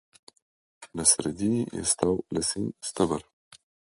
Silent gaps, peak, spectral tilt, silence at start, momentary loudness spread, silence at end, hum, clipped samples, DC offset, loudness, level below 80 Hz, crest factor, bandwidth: none; -4 dBFS; -3.5 dB/octave; 0.8 s; 11 LU; 0.65 s; none; under 0.1%; under 0.1%; -26 LUFS; -54 dBFS; 24 dB; 11.5 kHz